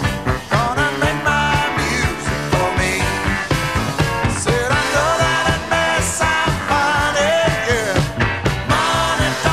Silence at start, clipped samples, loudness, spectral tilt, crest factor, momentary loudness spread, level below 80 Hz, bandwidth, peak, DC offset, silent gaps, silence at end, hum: 0 s; under 0.1%; -17 LUFS; -4 dB/octave; 14 dB; 3 LU; -30 dBFS; 15.5 kHz; -2 dBFS; 0.5%; none; 0 s; none